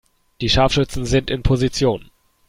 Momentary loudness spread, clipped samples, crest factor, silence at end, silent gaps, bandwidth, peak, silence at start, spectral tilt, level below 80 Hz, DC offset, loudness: 6 LU; under 0.1%; 18 dB; 0.45 s; none; 15.5 kHz; -2 dBFS; 0.4 s; -5.5 dB/octave; -30 dBFS; under 0.1%; -19 LUFS